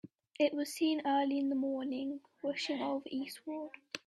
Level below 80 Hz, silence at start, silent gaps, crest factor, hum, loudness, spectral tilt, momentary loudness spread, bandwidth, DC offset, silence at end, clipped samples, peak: -84 dBFS; 0.4 s; none; 16 dB; none; -36 LUFS; -3.5 dB/octave; 11 LU; 13 kHz; under 0.1%; 0.1 s; under 0.1%; -18 dBFS